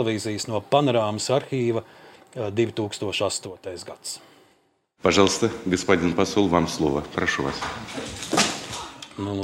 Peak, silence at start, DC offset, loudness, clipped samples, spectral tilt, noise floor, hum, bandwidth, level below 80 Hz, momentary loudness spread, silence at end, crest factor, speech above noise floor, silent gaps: -2 dBFS; 0 s; under 0.1%; -24 LUFS; under 0.1%; -4 dB/octave; -65 dBFS; none; 16.5 kHz; -52 dBFS; 14 LU; 0 s; 22 dB; 41 dB; none